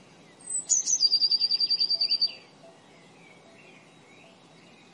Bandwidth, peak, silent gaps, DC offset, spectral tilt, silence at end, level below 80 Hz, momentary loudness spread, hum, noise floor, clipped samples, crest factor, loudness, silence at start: 11.5 kHz; -12 dBFS; none; under 0.1%; 2 dB/octave; 2.25 s; -86 dBFS; 8 LU; none; -54 dBFS; under 0.1%; 18 dB; -23 LUFS; 0.45 s